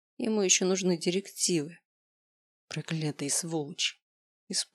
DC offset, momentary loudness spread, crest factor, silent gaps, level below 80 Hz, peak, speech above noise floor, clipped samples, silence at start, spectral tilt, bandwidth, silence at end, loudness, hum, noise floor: under 0.1%; 11 LU; 22 dB; 1.85-2.68 s, 4.02-4.47 s; -90 dBFS; -10 dBFS; over 60 dB; under 0.1%; 0.2 s; -3 dB/octave; 16 kHz; 0.1 s; -29 LUFS; none; under -90 dBFS